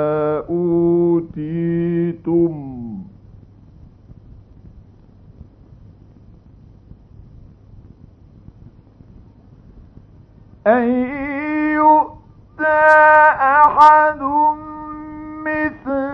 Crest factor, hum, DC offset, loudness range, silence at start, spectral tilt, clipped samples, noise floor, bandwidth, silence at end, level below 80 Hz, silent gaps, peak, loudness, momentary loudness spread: 18 dB; none; under 0.1%; 13 LU; 0 s; -8.5 dB/octave; under 0.1%; -45 dBFS; 7.4 kHz; 0 s; -48 dBFS; none; 0 dBFS; -15 LUFS; 20 LU